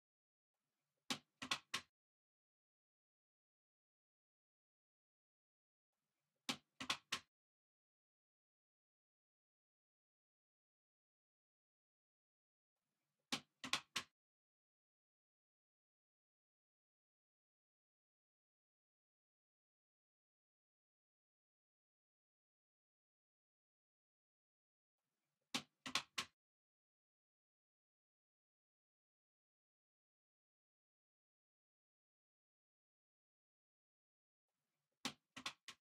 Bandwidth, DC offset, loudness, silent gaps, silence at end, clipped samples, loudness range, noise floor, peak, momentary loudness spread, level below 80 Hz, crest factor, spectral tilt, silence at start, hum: 8.4 kHz; under 0.1%; -47 LUFS; 1.89-5.93 s, 7.28-12.76 s, 14.11-24.98 s, 26.33-34.49 s, 34.97-35.04 s, 35.62-35.68 s; 0.1 s; under 0.1%; 6 LU; under -90 dBFS; -20 dBFS; 8 LU; under -90 dBFS; 38 dB; -1 dB/octave; 1.1 s; none